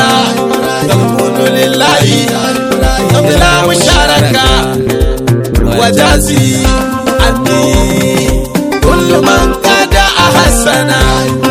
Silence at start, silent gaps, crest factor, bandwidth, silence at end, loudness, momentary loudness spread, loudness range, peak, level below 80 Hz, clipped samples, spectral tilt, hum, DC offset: 0 s; none; 8 dB; 18.5 kHz; 0 s; -8 LUFS; 5 LU; 1 LU; 0 dBFS; -18 dBFS; 2%; -4.5 dB/octave; none; under 0.1%